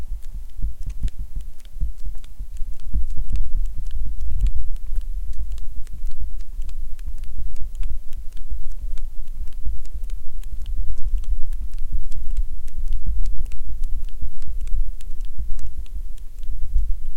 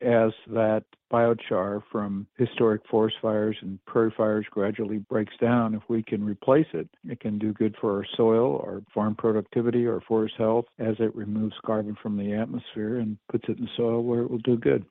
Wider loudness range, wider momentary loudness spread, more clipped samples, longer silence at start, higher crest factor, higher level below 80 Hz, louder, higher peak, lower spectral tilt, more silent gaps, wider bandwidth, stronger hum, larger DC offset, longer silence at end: about the same, 5 LU vs 3 LU; about the same, 8 LU vs 8 LU; neither; about the same, 0 s vs 0 s; second, 12 dB vs 18 dB; first, -24 dBFS vs -64 dBFS; second, -33 LUFS vs -26 LUFS; first, -2 dBFS vs -8 dBFS; about the same, -6.5 dB/octave vs -6.5 dB/octave; neither; second, 0.5 kHz vs 4 kHz; neither; neither; about the same, 0 s vs 0.05 s